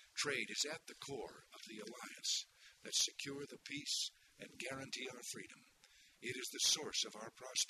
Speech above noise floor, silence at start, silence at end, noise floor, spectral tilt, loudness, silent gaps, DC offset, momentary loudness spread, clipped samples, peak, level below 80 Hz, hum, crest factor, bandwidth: 24 dB; 0 s; 0 s; -68 dBFS; -0.5 dB/octave; -41 LUFS; none; under 0.1%; 17 LU; under 0.1%; -22 dBFS; -82 dBFS; none; 22 dB; 13.5 kHz